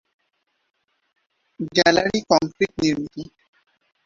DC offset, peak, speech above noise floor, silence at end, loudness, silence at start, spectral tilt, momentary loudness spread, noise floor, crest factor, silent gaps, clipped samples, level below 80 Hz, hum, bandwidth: under 0.1%; -2 dBFS; 52 dB; 0.8 s; -20 LUFS; 1.6 s; -4 dB/octave; 17 LU; -72 dBFS; 22 dB; none; under 0.1%; -56 dBFS; none; 7.6 kHz